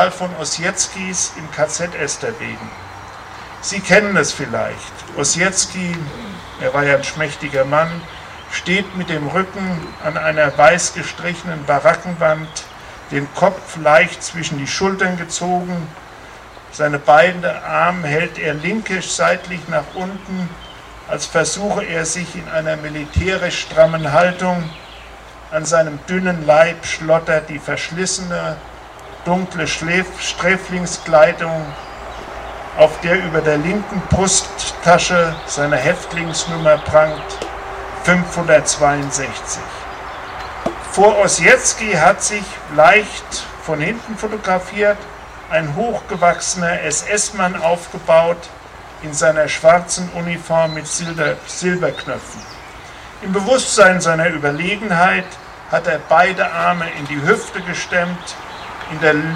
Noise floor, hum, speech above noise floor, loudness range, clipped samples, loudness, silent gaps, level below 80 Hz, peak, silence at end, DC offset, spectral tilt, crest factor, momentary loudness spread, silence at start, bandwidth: -37 dBFS; none; 20 dB; 5 LU; under 0.1%; -16 LUFS; none; -42 dBFS; 0 dBFS; 0 s; under 0.1%; -3.5 dB/octave; 18 dB; 17 LU; 0 s; 13.5 kHz